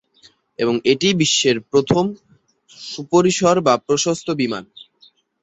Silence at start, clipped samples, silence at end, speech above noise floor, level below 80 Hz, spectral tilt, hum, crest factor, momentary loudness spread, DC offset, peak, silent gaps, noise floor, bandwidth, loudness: 0.6 s; under 0.1%; 0.8 s; 37 dB; -56 dBFS; -4 dB/octave; none; 18 dB; 15 LU; under 0.1%; -2 dBFS; none; -54 dBFS; 8.4 kHz; -17 LUFS